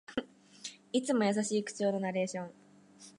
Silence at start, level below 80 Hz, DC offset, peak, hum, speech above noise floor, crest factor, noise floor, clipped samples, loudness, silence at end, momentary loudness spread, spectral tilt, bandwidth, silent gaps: 0.1 s; -78 dBFS; under 0.1%; -16 dBFS; none; 25 dB; 18 dB; -57 dBFS; under 0.1%; -33 LUFS; 0.1 s; 16 LU; -4.5 dB/octave; 11.5 kHz; none